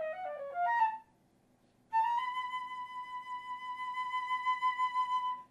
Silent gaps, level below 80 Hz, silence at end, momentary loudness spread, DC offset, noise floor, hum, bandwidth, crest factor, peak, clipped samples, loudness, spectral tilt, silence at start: none; -82 dBFS; 0.05 s; 11 LU; under 0.1%; -69 dBFS; none; 12 kHz; 16 dB; -20 dBFS; under 0.1%; -35 LUFS; -1.5 dB/octave; 0 s